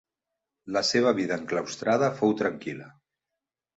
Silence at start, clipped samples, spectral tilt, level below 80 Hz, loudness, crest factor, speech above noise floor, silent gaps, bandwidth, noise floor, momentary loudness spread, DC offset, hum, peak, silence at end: 0.65 s; under 0.1%; -4.5 dB/octave; -68 dBFS; -26 LUFS; 20 dB; 61 dB; none; 8.2 kHz; -87 dBFS; 12 LU; under 0.1%; none; -8 dBFS; 0.9 s